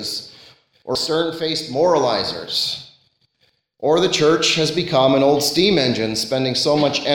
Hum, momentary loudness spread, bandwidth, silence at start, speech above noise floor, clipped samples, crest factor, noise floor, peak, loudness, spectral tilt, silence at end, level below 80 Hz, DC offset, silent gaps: none; 9 LU; 17 kHz; 0 s; 47 dB; under 0.1%; 16 dB; -64 dBFS; -2 dBFS; -18 LUFS; -4 dB/octave; 0 s; -54 dBFS; under 0.1%; none